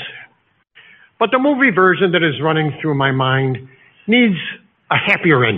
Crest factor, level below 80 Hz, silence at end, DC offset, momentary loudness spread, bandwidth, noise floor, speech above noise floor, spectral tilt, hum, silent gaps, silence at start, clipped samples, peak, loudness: 16 dB; -58 dBFS; 0 s; under 0.1%; 15 LU; 5.2 kHz; -59 dBFS; 44 dB; -4 dB/octave; none; none; 0 s; under 0.1%; 0 dBFS; -15 LUFS